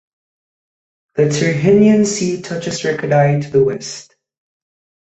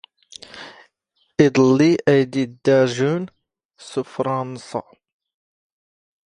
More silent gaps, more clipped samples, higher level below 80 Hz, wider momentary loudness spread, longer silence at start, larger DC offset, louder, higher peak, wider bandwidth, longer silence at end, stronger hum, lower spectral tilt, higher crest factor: second, none vs 3.65-3.69 s; neither; first, -54 dBFS vs -62 dBFS; second, 15 LU vs 23 LU; first, 1.15 s vs 0.55 s; neither; first, -15 LUFS vs -19 LUFS; about the same, -2 dBFS vs 0 dBFS; second, 8.2 kHz vs 10.5 kHz; second, 1 s vs 1.45 s; neither; about the same, -6 dB/octave vs -6.5 dB/octave; second, 14 dB vs 20 dB